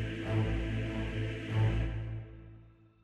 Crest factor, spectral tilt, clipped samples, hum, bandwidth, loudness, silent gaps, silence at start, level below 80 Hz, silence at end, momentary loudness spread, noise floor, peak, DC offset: 14 dB; -7.5 dB/octave; under 0.1%; none; 7.8 kHz; -35 LUFS; none; 0 s; -42 dBFS; 0.3 s; 16 LU; -57 dBFS; -20 dBFS; under 0.1%